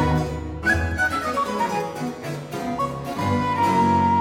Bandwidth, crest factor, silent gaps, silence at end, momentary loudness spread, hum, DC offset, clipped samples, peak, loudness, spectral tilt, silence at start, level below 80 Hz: 17 kHz; 14 dB; none; 0 s; 11 LU; none; under 0.1%; under 0.1%; -8 dBFS; -23 LUFS; -6 dB/octave; 0 s; -40 dBFS